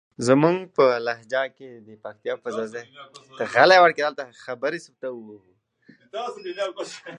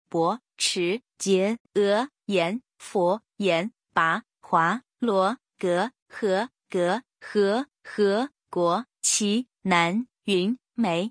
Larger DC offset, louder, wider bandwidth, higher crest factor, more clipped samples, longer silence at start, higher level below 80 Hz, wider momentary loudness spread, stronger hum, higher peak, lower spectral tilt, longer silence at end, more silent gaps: neither; first, -22 LUFS vs -25 LUFS; about the same, 10.5 kHz vs 10.5 kHz; about the same, 22 dB vs 20 dB; neither; about the same, 0.2 s vs 0.15 s; about the same, -72 dBFS vs -74 dBFS; first, 21 LU vs 7 LU; neither; first, -2 dBFS vs -6 dBFS; about the same, -5 dB/octave vs -4 dB/octave; about the same, 0 s vs 0 s; second, none vs 1.60-1.65 s, 6.02-6.06 s